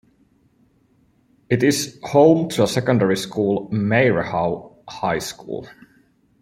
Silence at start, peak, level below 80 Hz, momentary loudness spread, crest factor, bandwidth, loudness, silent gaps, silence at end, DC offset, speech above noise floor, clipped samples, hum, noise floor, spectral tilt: 1.5 s; -2 dBFS; -56 dBFS; 16 LU; 20 dB; 16 kHz; -19 LUFS; none; 0.7 s; under 0.1%; 41 dB; under 0.1%; none; -60 dBFS; -5.5 dB/octave